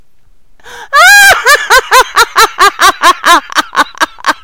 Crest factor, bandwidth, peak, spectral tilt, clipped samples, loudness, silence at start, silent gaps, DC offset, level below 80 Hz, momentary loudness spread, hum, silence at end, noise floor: 8 dB; over 20 kHz; 0 dBFS; 0.5 dB/octave; 6%; -5 LUFS; 0.7 s; none; 2%; -38 dBFS; 10 LU; none; 0.1 s; -46 dBFS